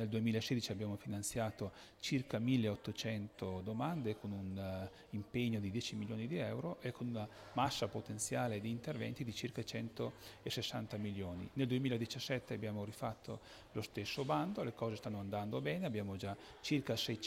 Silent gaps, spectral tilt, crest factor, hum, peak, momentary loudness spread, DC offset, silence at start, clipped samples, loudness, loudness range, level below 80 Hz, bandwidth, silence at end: none; -5.5 dB/octave; 20 dB; none; -22 dBFS; 8 LU; under 0.1%; 0 s; under 0.1%; -41 LUFS; 2 LU; -70 dBFS; 16 kHz; 0 s